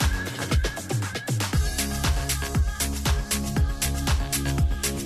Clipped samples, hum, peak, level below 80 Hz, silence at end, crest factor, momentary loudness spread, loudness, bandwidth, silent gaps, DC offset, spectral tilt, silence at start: under 0.1%; none; -10 dBFS; -28 dBFS; 0 s; 14 dB; 3 LU; -26 LUFS; 14 kHz; none; under 0.1%; -4 dB/octave; 0 s